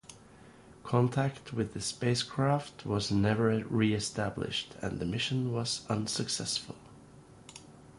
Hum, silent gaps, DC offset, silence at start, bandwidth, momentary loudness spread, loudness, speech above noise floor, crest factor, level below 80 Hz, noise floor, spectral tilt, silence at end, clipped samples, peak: none; none; under 0.1%; 0.1 s; 11.5 kHz; 19 LU; -32 LUFS; 24 dB; 20 dB; -58 dBFS; -55 dBFS; -5 dB/octave; 0 s; under 0.1%; -12 dBFS